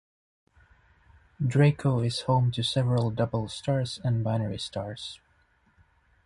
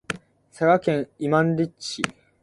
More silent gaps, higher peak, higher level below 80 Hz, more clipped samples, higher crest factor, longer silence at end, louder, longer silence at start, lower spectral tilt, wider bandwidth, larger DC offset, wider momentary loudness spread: neither; second, -10 dBFS vs -2 dBFS; about the same, -56 dBFS vs -60 dBFS; neither; about the same, 18 dB vs 22 dB; first, 1.1 s vs 0.3 s; second, -27 LUFS vs -23 LUFS; first, 1.4 s vs 0.1 s; about the same, -6.5 dB/octave vs -6 dB/octave; about the same, 11.5 kHz vs 11.5 kHz; neither; about the same, 12 LU vs 11 LU